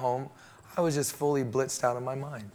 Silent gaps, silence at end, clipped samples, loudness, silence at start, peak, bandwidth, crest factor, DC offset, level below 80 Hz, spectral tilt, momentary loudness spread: none; 0.05 s; under 0.1%; -30 LUFS; 0 s; -14 dBFS; over 20 kHz; 18 dB; under 0.1%; -70 dBFS; -5 dB/octave; 9 LU